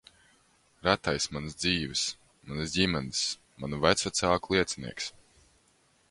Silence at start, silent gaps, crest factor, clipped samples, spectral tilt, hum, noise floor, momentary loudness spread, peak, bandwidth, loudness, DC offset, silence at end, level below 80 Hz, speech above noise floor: 0.85 s; none; 26 dB; under 0.1%; -3.5 dB/octave; none; -67 dBFS; 12 LU; -6 dBFS; 11.5 kHz; -29 LUFS; under 0.1%; 1 s; -52 dBFS; 37 dB